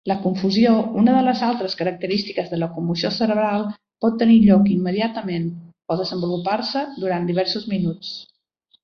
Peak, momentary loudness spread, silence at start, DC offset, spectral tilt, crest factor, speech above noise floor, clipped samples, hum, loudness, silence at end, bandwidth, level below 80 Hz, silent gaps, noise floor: -4 dBFS; 11 LU; 0.05 s; under 0.1%; -7.5 dB/octave; 16 dB; 44 dB; under 0.1%; none; -20 LUFS; 0.6 s; 6.6 kHz; -56 dBFS; none; -63 dBFS